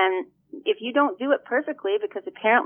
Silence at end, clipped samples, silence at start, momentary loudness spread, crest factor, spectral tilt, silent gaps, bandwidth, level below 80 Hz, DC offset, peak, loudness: 0 s; under 0.1%; 0 s; 9 LU; 18 dB; -7.5 dB/octave; none; 3.6 kHz; -82 dBFS; under 0.1%; -6 dBFS; -25 LUFS